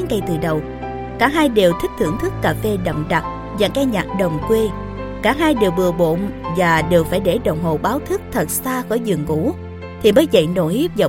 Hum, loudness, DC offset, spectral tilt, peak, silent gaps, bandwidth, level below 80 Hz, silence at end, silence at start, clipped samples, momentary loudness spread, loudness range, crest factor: none; -18 LUFS; under 0.1%; -5.5 dB/octave; 0 dBFS; none; 17 kHz; -36 dBFS; 0 s; 0 s; under 0.1%; 8 LU; 2 LU; 18 dB